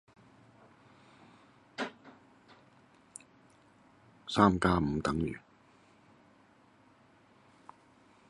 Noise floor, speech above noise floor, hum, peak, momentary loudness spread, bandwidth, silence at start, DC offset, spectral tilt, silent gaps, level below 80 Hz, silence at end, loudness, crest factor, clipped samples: -63 dBFS; 35 dB; none; -10 dBFS; 26 LU; 11.5 kHz; 1.8 s; under 0.1%; -6 dB/octave; none; -54 dBFS; 2.9 s; -31 LUFS; 26 dB; under 0.1%